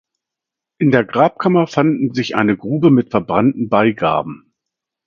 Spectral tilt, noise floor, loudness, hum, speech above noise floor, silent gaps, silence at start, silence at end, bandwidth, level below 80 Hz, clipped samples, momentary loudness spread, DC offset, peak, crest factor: -7.5 dB/octave; -84 dBFS; -15 LUFS; none; 69 dB; none; 0.8 s; 0.7 s; 7.2 kHz; -54 dBFS; under 0.1%; 5 LU; under 0.1%; 0 dBFS; 16 dB